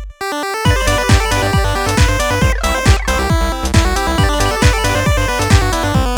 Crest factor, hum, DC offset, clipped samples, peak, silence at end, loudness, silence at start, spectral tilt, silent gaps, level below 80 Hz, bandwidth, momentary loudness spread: 14 dB; none; under 0.1%; under 0.1%; 0 dBFS; 0 s; -14 LUFS; 0 s; -4.5 dB/octave; none; -18 dBFS; over 20 kHz; 3 LU